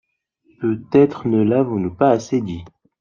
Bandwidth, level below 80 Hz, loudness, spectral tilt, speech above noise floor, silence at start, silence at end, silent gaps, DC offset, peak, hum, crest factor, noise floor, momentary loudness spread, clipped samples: 7.4 kHz; -56 dBFS; -18 LUFS; -8 dB/octave; 44 dB; 0.6 s; 0.3 s; none; under 0.1%; -2 dBFS; none; 16 dB; -61 dBFS; 10 LU; under 0.1%